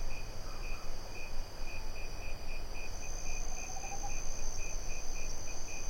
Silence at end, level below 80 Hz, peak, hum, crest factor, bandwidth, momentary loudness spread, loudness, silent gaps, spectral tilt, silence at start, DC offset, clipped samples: 0 s; -38 dBFS; -22 dBFS; none; 12 dB; 15.5 kHz; 4 LU; -43 LUFS; none; -2.5 dB/octave; 0 s; under 0.1%; under 0.1%